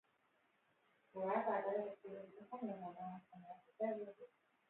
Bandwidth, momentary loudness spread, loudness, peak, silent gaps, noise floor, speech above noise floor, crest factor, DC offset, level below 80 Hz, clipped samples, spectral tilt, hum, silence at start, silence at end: 4 kHz; 19 LU; -45 LUFS; -26 dBFS; none; -79 dBFS; 34 dB; 20 dB; under 0.1%; under -90 dBFS; under 0.1%; -6 dB/octave; none; 1.15 s; 0.45 s